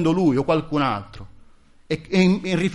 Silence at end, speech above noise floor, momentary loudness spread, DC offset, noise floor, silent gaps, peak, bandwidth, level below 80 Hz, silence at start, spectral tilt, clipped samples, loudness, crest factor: 0 s; 29 dB; 11 LU; under 0.1%; -49 dBFS; none; -4 dBFS; 11 kHz; -48 dBFS; 0 s; -7 dB/octave; under 0.1%; -21 LUFS; 16 dB